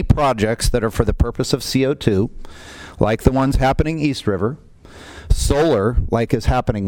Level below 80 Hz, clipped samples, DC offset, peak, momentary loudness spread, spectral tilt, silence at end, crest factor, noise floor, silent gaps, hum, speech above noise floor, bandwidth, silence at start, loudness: -26 dBFS; under 0.1%; under 0.1%; 0 dBFS; 9 LU; -6 dB/octave; 0 s; 18 dB; -40 dBFS; none; none; 23 dB; 17.5 kHz; 0 s; -18 LUFS